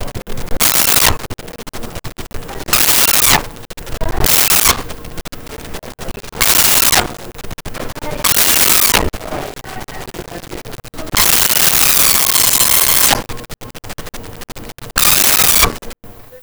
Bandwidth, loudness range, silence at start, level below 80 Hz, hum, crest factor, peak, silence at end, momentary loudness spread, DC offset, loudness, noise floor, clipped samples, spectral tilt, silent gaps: over 20 kHz; 4 LU; 0 s; -30 dBFS; none; 14 dB; 0 dBFS; 0.05 s; 22 LU; under 0.1%; -9 LUFS; -35 dBFS; under 0.1%; -1 dB/octave; none